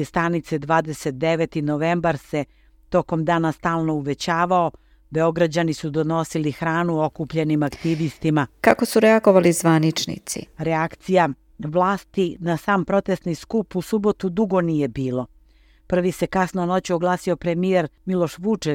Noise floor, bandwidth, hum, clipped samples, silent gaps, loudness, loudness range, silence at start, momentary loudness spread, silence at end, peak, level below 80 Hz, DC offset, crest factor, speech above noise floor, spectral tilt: -54 dBFS; 18 kHz; none; under 0.1%; none; -21 LUFS; 4 LU; 0 s; 8 LU; 0 s; 0 dBFS; -50 dBFS; under 0.1%; 22 dB; 33 dB; -6 dB/octave